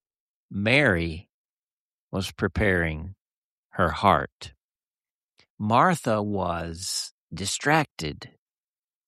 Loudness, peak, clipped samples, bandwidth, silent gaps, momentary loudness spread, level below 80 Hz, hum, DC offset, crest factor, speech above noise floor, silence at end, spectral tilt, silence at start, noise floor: -25 LUFS; -4 dBFS; under 0.1%; 13.5 kHz; 1.29-2.11 s, 3.21-3.70 s, 4.32-4.40 s, 4.63-4.95 s, 5.10-5.33 s, 5.50-5.58 s, 7.11-7.28 s, 7.91-7.97 s; 17 LU; -46 dBFS; none; under 0.1%; 22 dB; over 65 dB; 0.8 s; -4.5 dB/octave; 0.5 s; under -90 dBFS